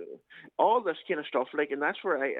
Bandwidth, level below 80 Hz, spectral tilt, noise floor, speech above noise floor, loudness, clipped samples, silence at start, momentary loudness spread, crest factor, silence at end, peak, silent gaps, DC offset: 4.4 kHz; -86 dBFS; -6.5 dB/octave; -49 dBFS; 20 dB; -29 LUFS; under 0.1%; 0 s; 16 LU; 20 dB; 0 s; -10 dBFS; none; under 0.1%